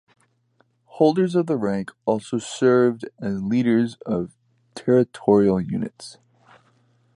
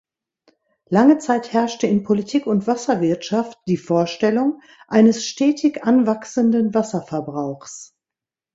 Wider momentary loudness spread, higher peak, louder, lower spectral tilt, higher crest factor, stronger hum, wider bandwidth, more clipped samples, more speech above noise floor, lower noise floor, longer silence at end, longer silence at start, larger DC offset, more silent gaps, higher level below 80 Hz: about the same, 13 LU vs 11 LU; about the same, -4 dBFS vs -2 dBFS; second, -22 LUFS vs -19 LUFS; about the same, -7 dB/octave vs -6 dB/octave; about the same, 18 dB vs 18 dB; neither; first, 11 kHz vs 8 kHz; neither; second, 44 dB vs 70 dB; second, -64 dBFS vs -88 dBFS; first, 1.05 s vs 0.7 s; about the same, 0.95 s vs 0.9 s; neither; neither; about the same, -58 dBFS vs -62 dBFS